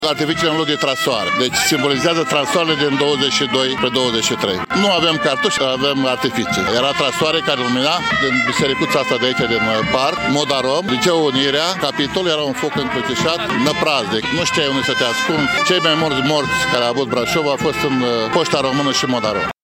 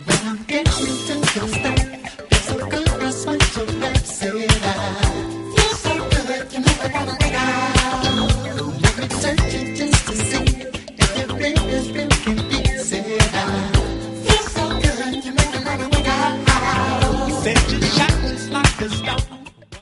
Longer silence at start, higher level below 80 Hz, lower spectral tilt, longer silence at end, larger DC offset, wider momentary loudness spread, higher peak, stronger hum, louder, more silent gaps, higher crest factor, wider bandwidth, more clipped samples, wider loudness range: about the same, 0 s vs 0 s; second, -48 dBFS vs -26 dBFS; about the same, -3.5 dB/octave vs -4 dB/octave; about the same, 0.1 s vs 0 s; neither; second, 3 LU vs 6 LU; about the same, -2 dBFS vs 0 dBFS; neither; first, -16 LUFS vs -19 LUFS; neither; about the same, 14 dB vs 18 dB; first, 17 kHz vs 11.5 kHz; neither; about the same, 1 LU vs 2 LU